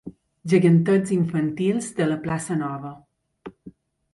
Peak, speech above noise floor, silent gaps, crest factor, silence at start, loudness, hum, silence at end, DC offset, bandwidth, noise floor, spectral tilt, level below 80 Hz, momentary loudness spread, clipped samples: -6 dBFS; 27 dB; none; 16 dB; 0.05 s; -22 LUFS; none; 0.45 s; under 0.1%; 11.5 kHz; -48 dBFS; -7 dB/octave; -60 dBFS; 22 LU; under 0.1%